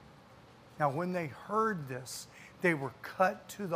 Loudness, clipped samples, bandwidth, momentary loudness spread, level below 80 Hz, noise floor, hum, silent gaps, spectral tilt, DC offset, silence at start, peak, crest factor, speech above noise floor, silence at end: -34 LUFS; under 0.1%; 15.5 kHz; 11 LU; -72 dBFS; -57 dBFS; none; none; -5.5 dB/octave; under 0.1%; 0 s; -14 dBFS; 22 dB; 23 dB; 0 s